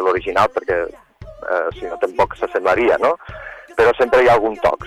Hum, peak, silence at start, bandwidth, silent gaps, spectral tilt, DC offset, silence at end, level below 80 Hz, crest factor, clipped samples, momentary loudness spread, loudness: none; -4 dBFS; 0 s; 14 kHz; none; -5.5 dB/octave; under 0.1%; 0 s; -44 dBFS; 14 dB; under 0.1%; 13 LU; -17 LUFS